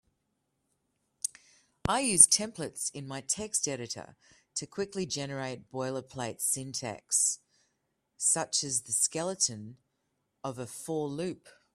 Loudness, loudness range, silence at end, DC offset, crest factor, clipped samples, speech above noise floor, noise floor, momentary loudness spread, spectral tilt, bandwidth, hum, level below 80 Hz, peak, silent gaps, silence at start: -29 LUFS; 8 LU; 0.25 s; under 0.1%; 32 dB; under 0.1%; 48 dB; -80 dBFS; 14 LU; -2 dB/octave; 15.5 kHz; none; -64 dBFS; -2 dBFS; none; 1.25 s